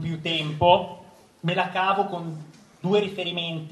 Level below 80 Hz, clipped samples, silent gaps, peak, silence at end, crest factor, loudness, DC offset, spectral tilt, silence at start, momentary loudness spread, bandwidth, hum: -56 dBFS; under 0.1%; none; -4 dBFS; 0 s; 22 dB; -24 LUFS; under 0.1%; -6 dB/octave; 0 s; 14 LU; 12 kHz; none